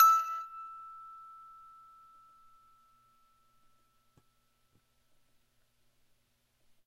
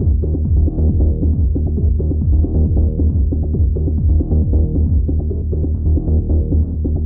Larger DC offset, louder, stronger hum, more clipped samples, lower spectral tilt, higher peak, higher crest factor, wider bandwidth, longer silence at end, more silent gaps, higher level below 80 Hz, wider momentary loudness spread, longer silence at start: neither; second, -31 LUFS vs -17 LUFS; first, 60 Hz at -85 dBFS vs none; neither; second, 1 dB/octave vs -19.5 dB/octave; second, -12 dBFS vs -4 dBFS; first, 26 dB vs 10 dB; first, 12.5 kHz vs 1 kHz; first, 5.8 s vs 0 s; neither; second, -78 dBFS vs -16 dBFS; first, 27 LU vs 3 LU; about the same, 0 s vs 0 s